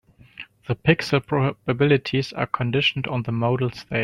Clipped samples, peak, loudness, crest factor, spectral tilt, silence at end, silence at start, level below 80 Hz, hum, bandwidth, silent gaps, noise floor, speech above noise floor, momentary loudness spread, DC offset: under 0.1%; -2 dBFS; -22 LUFS; 20 dB; -6.5 dB/octave; 0 s; 0.4 s; -52 dBFS; none; 12 kHz; none; -44 dBFS; 22 dB; 9 LU; under 0.1%